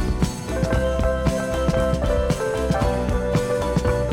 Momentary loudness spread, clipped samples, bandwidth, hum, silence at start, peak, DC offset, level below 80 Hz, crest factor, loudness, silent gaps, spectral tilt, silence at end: 2 LU; under 0.1%; 16.5 kHz; none; 0 s; -6 dBFS; under 0.1%; -26 dBFS; 16 dB; -22 LUFS; none; -6.5 dB/octave; 0 s